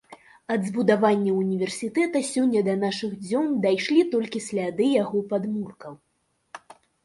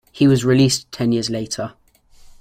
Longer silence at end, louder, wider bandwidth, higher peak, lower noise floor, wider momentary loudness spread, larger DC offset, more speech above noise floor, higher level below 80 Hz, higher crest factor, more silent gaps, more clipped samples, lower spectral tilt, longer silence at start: second, 0.5 s vs 0.7 s; second, -24 LUFS vs -18 LUFS; second, 11.5 kHz vs 15.5 kHz; about the same, -6 dBFS vs -4 dBFS; about the same, -50 dBFS vs -47 dBFS; about the same, 12 LU vs 12 LU; neither; about the same, 27 dB vs 30 dB; second, -70 dBFS vs -50 dBFS; about the same, 18 dB vs 14 dB; neither; neither; about the same, -5.5 dB/octave vs -5.5 dB/octave; about the same, 0.1 s vs 0.15 s